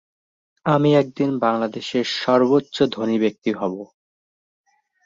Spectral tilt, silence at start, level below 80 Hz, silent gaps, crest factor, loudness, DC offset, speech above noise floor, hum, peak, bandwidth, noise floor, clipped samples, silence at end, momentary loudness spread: -6.5 dB/octave; 0.65 s; -64 dBFS; 3.38-3.42 s; 18 dB; -20 LUFS; under 0.1%; over 71 dB; none; -4 dBFS; 7.6 kHz; under -90 dBFS; under 0.1%; 1.2 s; 9 LU